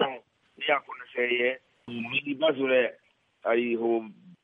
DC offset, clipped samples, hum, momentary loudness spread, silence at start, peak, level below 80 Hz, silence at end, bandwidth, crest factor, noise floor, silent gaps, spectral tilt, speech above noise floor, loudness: under 0.1%; under 0.1%; none; 13 LU; 0 s; -10 dBFS; -80 dBFS; 0.1 s; 3.9 kHz; 18 dB; -47 dBFS; none; -7 dB/octave; 21 dB; -28 LUFS